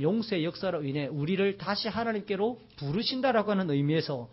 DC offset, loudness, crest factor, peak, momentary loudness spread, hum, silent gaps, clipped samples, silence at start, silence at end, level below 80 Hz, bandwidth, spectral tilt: under 0.1%; -30 LUFS; 14 dB; -14 dBFS; 5 LU; none; none; under 0.1%; 0 s; 0.05 s; -64 dBFS; 5.8 kHz; -10 dB/octave